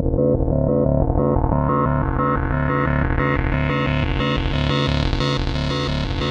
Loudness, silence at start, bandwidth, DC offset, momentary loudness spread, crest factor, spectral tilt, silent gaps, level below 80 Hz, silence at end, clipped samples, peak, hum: -20 LUFS; 0 s; 8 kHz; under 0.1%; 3 LU; 16 dB; -7.5 dB/octave; none; -26 dBFS; 0 s; under 0.1%; -2 dBFS; none